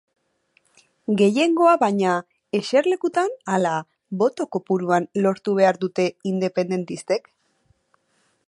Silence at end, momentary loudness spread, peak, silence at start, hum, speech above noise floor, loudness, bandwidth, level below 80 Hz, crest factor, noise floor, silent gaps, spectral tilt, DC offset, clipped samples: 1.3 s; 10 LU; -4 dBFS; 1.1 s; none; 46 dB; -21 LUFS; 11.5 kHz; -72 dBFS; 18 dB; -67 dBFS; none; -6 dB/octave; under 0.1%; under 0.1%